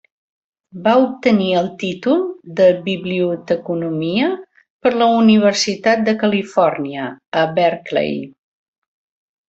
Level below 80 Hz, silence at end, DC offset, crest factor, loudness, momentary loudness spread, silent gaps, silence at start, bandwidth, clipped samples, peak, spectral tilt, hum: -60 dBFS; 1.2 s; under 0.1%; 16 dB; -17 LUFS; 10 LU; 4.70-4.79 s, 7.28-7.32 s; 0.75 s; 8 kHz; under 0.1%; -2 dBFS; -5.5 dB/octave; none